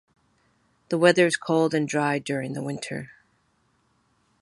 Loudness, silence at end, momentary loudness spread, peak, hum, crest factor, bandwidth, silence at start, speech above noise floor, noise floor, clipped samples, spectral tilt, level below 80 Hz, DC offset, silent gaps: -24 LUFS; 1.35 s; 15 LU; -4 dBFS; none; 22 dB; 11.5 kHz; 0.9 s; 44 dB; -68 dBFS; under 0.1%; -5 dB/octave; -70 dBFS; under 0.1%; none